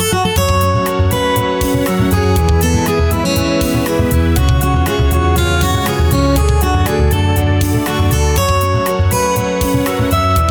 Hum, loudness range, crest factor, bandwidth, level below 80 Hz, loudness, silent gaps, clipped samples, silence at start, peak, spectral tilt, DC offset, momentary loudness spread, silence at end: none; 1 LU; 10 dB; over 20 kHz; -20 dBFS; -14 LUFS; none; under 0.1%; 0 s; -2 dBFS; -5.5 dB/octave; under 0.1%; 2 LU; 0 s